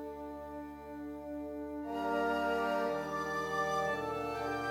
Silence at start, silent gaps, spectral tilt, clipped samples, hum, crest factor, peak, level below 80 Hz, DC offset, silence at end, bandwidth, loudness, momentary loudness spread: 0 s; none; -5 dB/octave; under 0.1%; none; 14 dB; -22 dBFS; -60 dBFS; under 0.1%; 0 s; 17 kHz; -36 LUFS; 12 LU